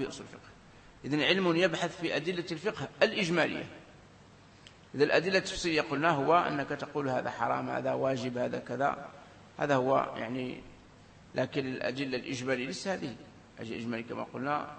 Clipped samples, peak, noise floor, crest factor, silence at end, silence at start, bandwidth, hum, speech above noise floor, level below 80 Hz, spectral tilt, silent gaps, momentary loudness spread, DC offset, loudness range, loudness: under 0.1%; -10 dBFS; -56 dBFS; 22 dB; 0 s; 0 s; 8.8 kHz; none; 25 dB; -62 dBFS; -5 dB/octave; none; 15 LU; under 0.1%; 6 LU; -31 LUFS